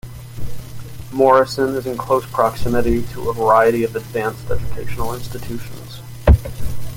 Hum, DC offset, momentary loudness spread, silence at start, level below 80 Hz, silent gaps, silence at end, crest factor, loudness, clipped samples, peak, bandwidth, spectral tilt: none; under 0.1%; 20 LU; 0.05 s; -28 dBFS; none; 0 s; 16 dB; -18 LUFS; under 0.1%; -2 dBFS; 17 kHz; -6.5 dB/octave